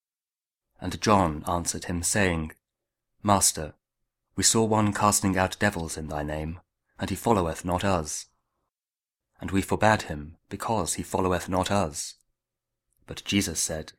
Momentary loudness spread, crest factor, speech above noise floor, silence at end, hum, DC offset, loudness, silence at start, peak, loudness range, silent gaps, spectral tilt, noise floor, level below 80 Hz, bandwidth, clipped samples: 15 LU; 24 dB; over 64 dB; 0.1 s; none; under 0.1%; -26 LUFS; 0.8 s; -4 dBFS; 6 LU; none; -4 dB/octave; under -90 dBFS; -48 dBFS; 16.5 kHz; under 0.1%